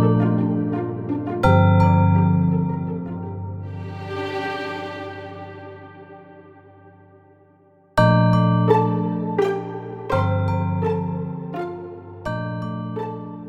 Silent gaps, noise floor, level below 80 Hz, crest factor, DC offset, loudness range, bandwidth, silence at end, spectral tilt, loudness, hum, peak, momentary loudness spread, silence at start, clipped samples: none; -54 dBFS; -46 dBFS; 18 dB; under 0.1%; 12 LU; 8 kHz; 0 s; -9 dB/octave; -21 LUFS; none; -2 dBFS; 17 LU; 0 s; under 0.1%